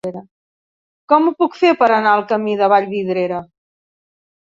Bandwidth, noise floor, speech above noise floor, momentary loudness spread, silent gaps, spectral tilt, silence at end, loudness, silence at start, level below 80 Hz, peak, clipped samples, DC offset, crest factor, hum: 7.6 kHz; under -90 dBFS; over 75 dB; 11 LU; 0.31-1.08 s; -7 dB/octave; 1 s; -15 LUFS; 0.05 s; -64 dBFS; 0 dBFS; under 0.1%; under 0.1%; 16 dB; none